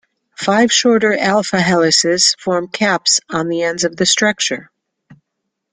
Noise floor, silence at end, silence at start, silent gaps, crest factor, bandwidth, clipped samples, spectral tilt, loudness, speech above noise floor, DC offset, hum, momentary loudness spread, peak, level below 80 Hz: -75 dBFS; 0.6 s; 0.4 s; none; 16 dB; 11 kHz; under 0.1%; -2.5 dB/octave; -14 LUFS; 61 dB; under 0.1%; none; 8 LU; 0 dBFS; -56 dBFS